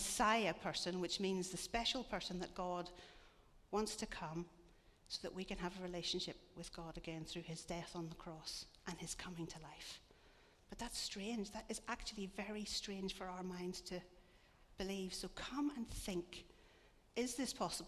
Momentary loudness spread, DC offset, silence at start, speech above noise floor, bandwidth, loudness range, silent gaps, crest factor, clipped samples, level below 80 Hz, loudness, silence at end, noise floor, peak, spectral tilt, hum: 12 LU; under 0.1%; 0 s; 23 dB; 14 kHz; 6 LU; none; 22 dB; under 0.1%; -62 dBFS; -45 LUFS; 0 s; -68 dBFS; -22 dBFS; -3.5 dB/octave; none